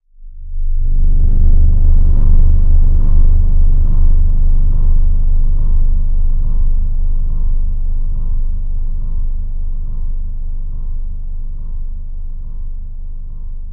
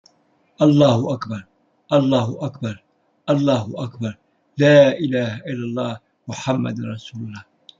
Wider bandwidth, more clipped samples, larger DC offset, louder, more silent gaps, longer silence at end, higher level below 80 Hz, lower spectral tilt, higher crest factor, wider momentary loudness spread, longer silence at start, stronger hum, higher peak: second, 1.1 kHz vs 7.6 kHz; neither; neither; about the same, -19 LUFS vs -19 LUFS; neither; second, 0 s vs 0.4 s; first, -10 dBFS vs -62 dBFS; first, -12 dB/octave vs -7 dB/octave; second, 10 dB vs 18 dB; second, 15 LU vs 20 LU; second, 0.2 s vs 0.6 s; neither; about the same, 0 dBFS vs -2 dBFS